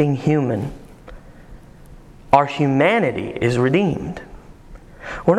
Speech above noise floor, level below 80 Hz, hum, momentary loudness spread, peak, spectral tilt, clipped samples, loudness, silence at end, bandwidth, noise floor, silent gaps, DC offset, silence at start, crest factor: 24 dB; -42 dBFS; none; 17 LU; 0 dBFS; -7.5 dB/octave; under 0.1%; -18 LUFS; 0 s; 11.5 kHz; -42 dBFS; none; under 0.1%; 0 s; 20 dB